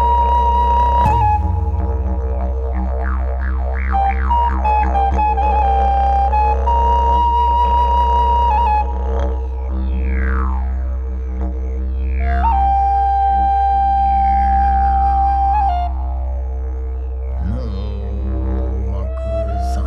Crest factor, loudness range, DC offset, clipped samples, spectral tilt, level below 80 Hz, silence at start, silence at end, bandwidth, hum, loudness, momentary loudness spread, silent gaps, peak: 12 dB; 7 LU; under 0.1%; under 0.1%; -8 dB/octave; -18 dBFS; 0 s; 0 s; 5 kHz; none; -17 LUFS; 9 LU; none; -2 dBFS